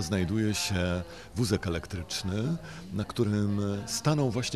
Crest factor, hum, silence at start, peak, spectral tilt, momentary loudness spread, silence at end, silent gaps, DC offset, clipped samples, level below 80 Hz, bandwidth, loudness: 16 dB; none; 0 s; -14 dBFS; -5 dB/octave; 7 LU; 0 s; none; 0.2%; under 0.1%; -52 dBFS; 14.5 kHz; -30 LUFS